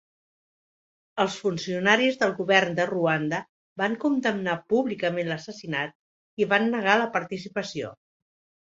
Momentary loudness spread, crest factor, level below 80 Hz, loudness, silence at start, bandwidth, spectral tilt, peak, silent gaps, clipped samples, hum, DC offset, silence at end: 13 LU; 22 dB; -70 dBFS; -25 LUFS; 1.15 s; 8 kHz; -5 dB/octave; -4 dBFS; 3.49-3.76 s, 5.95-6.37 s; under 0.1%; none; under 0.1%; 0.75 s